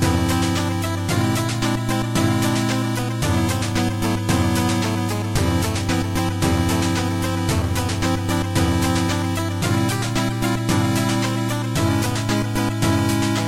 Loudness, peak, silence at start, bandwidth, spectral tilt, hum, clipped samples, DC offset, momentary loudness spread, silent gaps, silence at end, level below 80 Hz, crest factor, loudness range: -21 LUFS; -6 dBFS; 0 s; 16.5 kHz; -5 dB/octave; none; under 0.1%; under 0.1%; 3 LU; none; 0 s; -36 dBFS; 14 dB; 0 LU